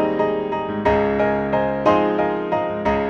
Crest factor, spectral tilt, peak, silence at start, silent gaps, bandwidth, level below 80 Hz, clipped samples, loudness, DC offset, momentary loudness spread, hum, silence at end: 16 dB; -7.5 dB/octave; -4 dBFS; 0 s; none; 7.2 kHz; -40 dBFS; under 0.1%; -20 LUFS; under 0.1%; 5 LU; none; 0 s